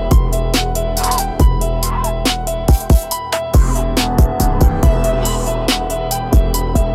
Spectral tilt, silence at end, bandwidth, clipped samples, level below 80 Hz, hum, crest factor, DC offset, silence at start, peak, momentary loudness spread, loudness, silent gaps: -5 dB/octave; 0 s; 16 kHz; under 0.1%; -16 dBFS; none; 12 dB; under 0.1%; 0 s; -2 dBFS; 4 LU; -16 LUFS; none